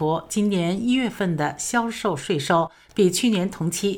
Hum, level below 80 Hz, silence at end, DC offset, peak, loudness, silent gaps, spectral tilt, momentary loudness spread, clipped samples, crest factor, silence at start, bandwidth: none; -56 dBFS; 0 s; under 0.1%; -8 dBFS; -23 LUFS; none; -5 dB/octave; 5 LU; under 0.1%; 14 dB; 0 s; 19.5 kHz